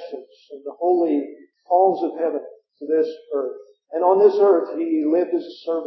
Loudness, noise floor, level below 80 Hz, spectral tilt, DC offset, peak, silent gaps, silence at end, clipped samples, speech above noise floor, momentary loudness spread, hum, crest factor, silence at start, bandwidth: -20 LUFS; -40 dBFS; under -90 dBFS; -8 dB/octave; under 0.1%; -4 dBFS; none; 0 s; under 0.1%; 21 dB; 21 LU; none; 18 dB; 0 s; 6 kHz